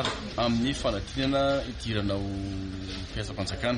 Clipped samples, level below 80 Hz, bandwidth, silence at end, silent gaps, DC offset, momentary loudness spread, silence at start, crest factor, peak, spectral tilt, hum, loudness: under 0.1%; -42 dBFS; 10.5 kHz; 0 s; none; under 0.1%; 9 LU; 0 s; 16 dB; -14 dBFS; -5.5 dB/octave; none; -30 LUFS